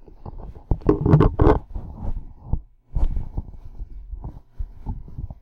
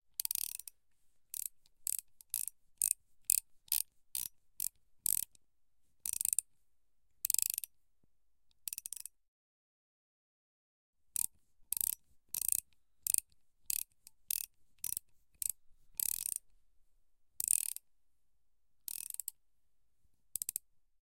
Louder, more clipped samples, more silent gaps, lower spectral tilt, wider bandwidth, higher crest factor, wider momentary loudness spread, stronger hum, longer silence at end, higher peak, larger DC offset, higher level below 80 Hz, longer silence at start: first, -23 LUFS vs -37 LUFS; neither; second, none vs 9.28-10.93 s; first, -11 dB/octave vs 2.5 dB/octave; second, 5.4 kHz vs 17 kHz; second, 20 dB vs 36 dB; first, 24 LU vs 13 LU; neither; second, 0.1 s vs 0.55 s; about the same, -4 dBFS vs -6 dBFS; neither; first, -28 dBFS vs -76 dBFS; about the same, 0.25 s vs 0.2 s